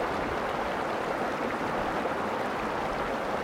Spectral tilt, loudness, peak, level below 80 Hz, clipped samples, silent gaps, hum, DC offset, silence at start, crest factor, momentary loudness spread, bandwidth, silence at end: -5 dB/octave; -30 LUFS; -16 dBFS; -52 dBFS; under 0.1%; none; none; under 0.1%; 0 s; 14 dB; 1 LU; 16.5 kHz; 0 s